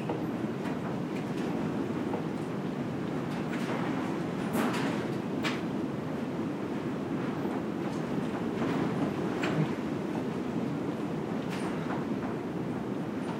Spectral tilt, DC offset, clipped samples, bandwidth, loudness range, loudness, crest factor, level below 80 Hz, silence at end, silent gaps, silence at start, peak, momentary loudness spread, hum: -7 dB/octave; under 0.1%; under 0.1%; 16 kHz; 2 LU; -33 LUFS; 16 dB; -64 dBFS; 0 s; none; 0 s; -16 dBFS; 4 LU; none